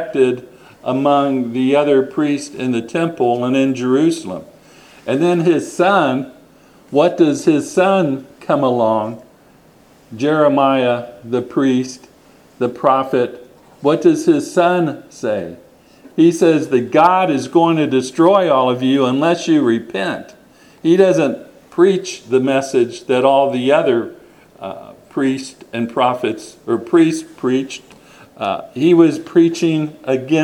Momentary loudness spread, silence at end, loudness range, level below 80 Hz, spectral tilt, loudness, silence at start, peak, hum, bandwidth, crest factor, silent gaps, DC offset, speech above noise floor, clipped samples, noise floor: 12 LU; 0 s; 5 LU; -62 dBFS; -6 dB/octave; -16 LUFS; 0 s; 0 dBFS; none; 12 kHz; 16 dB; none; under 0.1%; 33 dB; under 0.1%; -48 dBFS